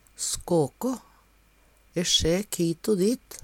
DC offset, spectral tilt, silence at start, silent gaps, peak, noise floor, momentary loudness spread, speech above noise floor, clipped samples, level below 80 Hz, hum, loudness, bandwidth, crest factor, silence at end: under 0.1%; -4 dB/octave; 0.2 s; none; -10 dBFS; -60 dBFS; 10 LU; 35 dB; under 0.1%; -48 dBFS; none; -26 LUFS; 17 kHz; 18 dB; 0.05 s